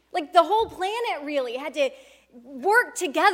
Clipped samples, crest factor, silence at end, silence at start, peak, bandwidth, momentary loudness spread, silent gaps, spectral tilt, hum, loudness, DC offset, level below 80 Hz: under 0.1%; 20 dB; 0 s; 0.15 s; -4 dBFS; 17 kHz; 8 LU; none; -2 dB/octave; none; -24 LUFS; under 0.1%; -62 dBFS